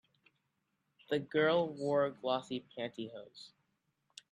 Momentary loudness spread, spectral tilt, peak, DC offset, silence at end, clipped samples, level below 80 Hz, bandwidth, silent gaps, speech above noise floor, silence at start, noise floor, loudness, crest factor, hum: 21 LU; -6 dB/octave; -20 dBFS; under 0.1%; 0.85 s; under 0.1%; -82 dBFS; 10.5 kHz; none; 47 dB; 1.1 s; -82 dBFS; -35 LUFS; 18 dB; none